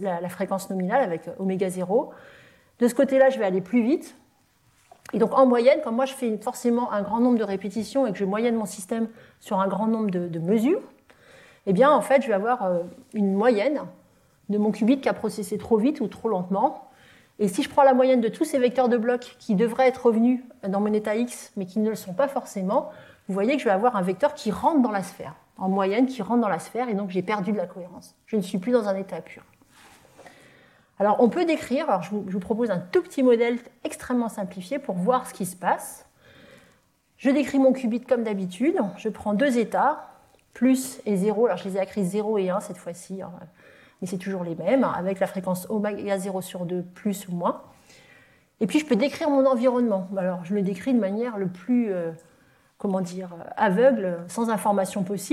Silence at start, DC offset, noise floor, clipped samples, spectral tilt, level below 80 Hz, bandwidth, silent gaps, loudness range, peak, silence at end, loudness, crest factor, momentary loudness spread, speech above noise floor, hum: 0 s; under 0.1%; -63 dBFS; under 0.1%; -6.5 dB/octave; -66 dBFS; 14.5 kHz; none; 5 LU; -6 dBFS; 0 s; -24 LUFS; 18 dB; 11 LU; 40 dB; none